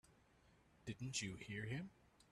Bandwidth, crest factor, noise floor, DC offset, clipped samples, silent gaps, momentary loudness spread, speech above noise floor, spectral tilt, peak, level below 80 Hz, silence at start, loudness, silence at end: 13 kHz; 20 dB; -73 dBFS; under 0.1%; under 0.1%; none; 11 LU; 25 dB; -4 dB/octave; -32 dBFS; -74 dBFS; 0.1 s; -48 LUFS; 0.1 s